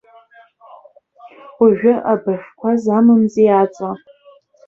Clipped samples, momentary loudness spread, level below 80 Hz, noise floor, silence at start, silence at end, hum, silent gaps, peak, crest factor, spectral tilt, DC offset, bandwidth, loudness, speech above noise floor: under 0.1%; 12 LU; -62 dBFS; -49 dBFS; 1.25 s; 0.7 s; none; none; -2 dBFS; 16 dB; -8.5 dB/octave; under 0.1%; 7.2 kHz; -15 LUFS; 35 dB